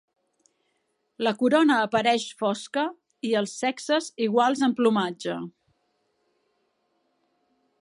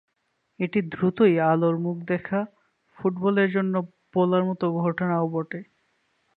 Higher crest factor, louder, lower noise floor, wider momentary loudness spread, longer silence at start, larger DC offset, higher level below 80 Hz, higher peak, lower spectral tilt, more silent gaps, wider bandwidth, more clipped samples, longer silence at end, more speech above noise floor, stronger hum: about the same, 18 dB vs 18 dB; about the same, -24 LUFS vs -24 LUFS; about the same, -74 dBFS vs -74 dBFS; about the same, 11 LU vs 9 LU; first, 1.2 s vs 0.6 s; neither; second, -76 dBFS vs -68 dBFS; about the same, -8 dBFS vs -8 dBFS; second, -4.5 dB/octave vs -10.5 dB/octave; neither; first, 11.5 kHz vs 4.7 kHz; neither; first, 2.3 s vs 0.75 s; about the same, 50 dB vs 51 dB; neither